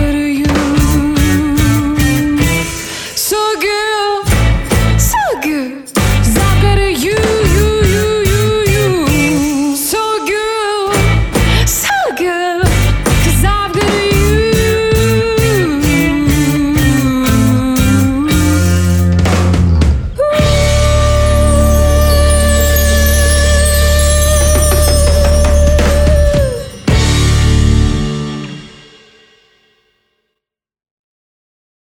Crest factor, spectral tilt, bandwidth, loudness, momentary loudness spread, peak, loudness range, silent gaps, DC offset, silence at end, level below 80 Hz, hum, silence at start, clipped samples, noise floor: 10 dB; -5 dB/octave; over 20 kHz; -11 LUFS; 5 LU; 0 dBFS; 3 LU; none; under 0.1%; 3.3 s; -16 dBFS; none; 0 s; under 0.1%; -79 dBFS